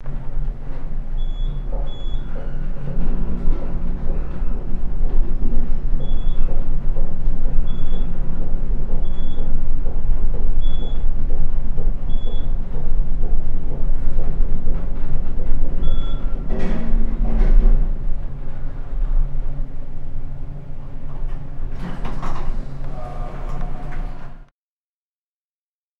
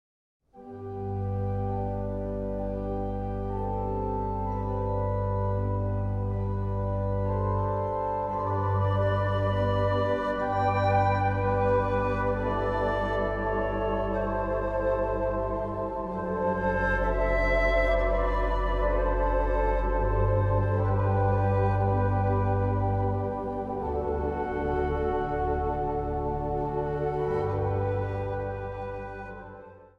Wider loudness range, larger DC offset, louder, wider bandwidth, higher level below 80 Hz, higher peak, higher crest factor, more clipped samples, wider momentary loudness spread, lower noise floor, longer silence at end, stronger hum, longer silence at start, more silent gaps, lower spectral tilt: about the same, 7 LU vs 5 LU; neither; about the same, -28 LUFS vs -28 LUFS; second, 3.6 kHz vs 5.8 kHz; first, -16 dBFS vs -36 dBFS; first, 0 dBFS vs -12 dBFS; about the same, 12 dB vs 14 dB; neither; about the same, 8 LU vs 7 LU; first, under -90 dBFS vs -47 dBFS; first, 1.65 s vs 0.1 s; neither; second, 0 s vs 0.55 s; neither; about the same, -8.5 dB/octave vs -9 dB/octave